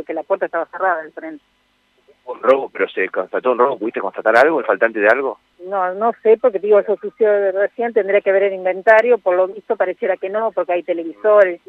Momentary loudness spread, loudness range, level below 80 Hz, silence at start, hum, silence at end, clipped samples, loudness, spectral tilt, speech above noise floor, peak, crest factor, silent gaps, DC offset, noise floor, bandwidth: 10 LU; 5 LU; -70 dBFS; 0 s; none; 0.1 s; under 0.1%; -17 LUFS; -6 dB/octave; 44 dB; 0 dBFS; 16 dB; none; under 0.1%; -61 dBFS; 7.4 kHz